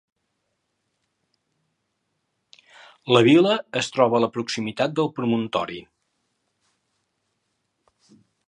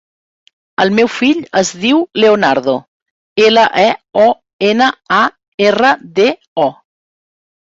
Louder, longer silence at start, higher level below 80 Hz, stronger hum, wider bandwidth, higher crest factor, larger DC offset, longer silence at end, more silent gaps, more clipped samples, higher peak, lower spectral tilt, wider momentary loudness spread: second, -21 LUFS vs -12 LUFS; first, 3.05 s vs 0.8 s; second, -68 dBFS vs -56 dBFS; neither; first, 10 kHz vs 8 kHz; first, 22 dB vs 14 dB; neither; first, 2.65 s vs 1 s; second, none vs 2.88-3.36 s, 4.53-4.59 s, 5.48-5.58 s, 6.48-6.56 s; neither; about the same, -2 dBFS vs 0 dBFS; first, -5.5 dB/octave vs -4 dB/octave; first, 12 LU vs 7 LU